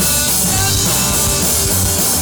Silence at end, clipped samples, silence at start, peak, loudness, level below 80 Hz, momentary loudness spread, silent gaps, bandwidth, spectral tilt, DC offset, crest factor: 0 s; under 0.1%; 0 s; -2 dBFS; -12 LUFS; -28 dBFS; 1 LU; none; over 20 kHz; -2 dB/octave; under 0.1%; 12 dB